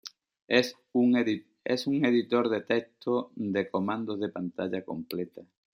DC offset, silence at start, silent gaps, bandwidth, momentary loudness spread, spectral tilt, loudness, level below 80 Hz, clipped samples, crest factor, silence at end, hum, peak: under 0.1%; 0.05 s; 0.44-0.48 s; 16 kHz; 11 LU; -6 dB/octave; -29 LUFS; -76 dBFS; under 0.1%; 22 dB; 0.3 s; none; -8 dBFS